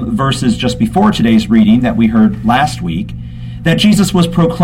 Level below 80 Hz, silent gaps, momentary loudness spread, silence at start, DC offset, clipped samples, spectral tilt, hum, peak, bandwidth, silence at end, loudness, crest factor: -30 dBFS; none; 10 LU; 0 s; under 0.1%; under 0.1%; -6 dB/octave; none; 0 dBFS; 16 kHz; 0 s; -11 LUFS; 10 dB